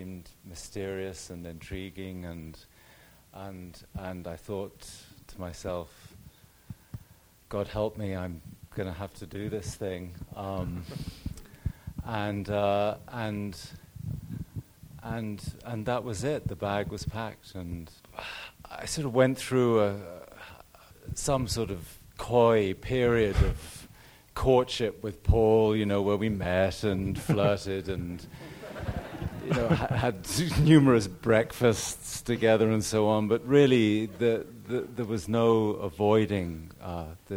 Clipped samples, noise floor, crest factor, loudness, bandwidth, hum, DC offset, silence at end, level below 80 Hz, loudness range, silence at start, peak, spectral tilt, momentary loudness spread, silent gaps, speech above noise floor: under 0.1%; -57 dBFS; 22 dB; -28 LUFS; over 20 kHz; none; under 0.1%; 0 s; -44 dBFS; 15 LU; 0 s; -6 dBFS; -6 dB/octave; 20 LU; none; 29 dB